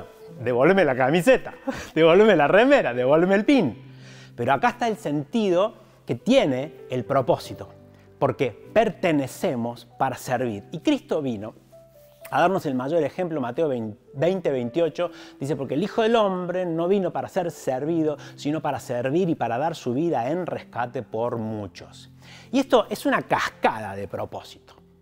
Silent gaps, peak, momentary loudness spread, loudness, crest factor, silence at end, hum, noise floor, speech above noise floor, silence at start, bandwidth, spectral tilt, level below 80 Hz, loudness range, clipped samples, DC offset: none; -6 dBFS; 14 LU; -23 LUFS; 18 dB; 0.5 s; none; -50 dBFS; 28 dB; 0 s; 16 kHz; -6 dB/octave; -56 dBFS; 7 LU; under 0.1%; under 0.1%